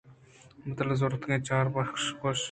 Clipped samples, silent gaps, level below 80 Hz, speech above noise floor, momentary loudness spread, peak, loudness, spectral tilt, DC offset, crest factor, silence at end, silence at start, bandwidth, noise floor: under 0.1%; none; -60 dBFS; 26 dB; 7 LU; -14 dBFS; -30 LUFS; -5 dB/octave; under 0.1%; 18 dB; 0 s; 0.05 s; 9.4 kHz; -55 dBFS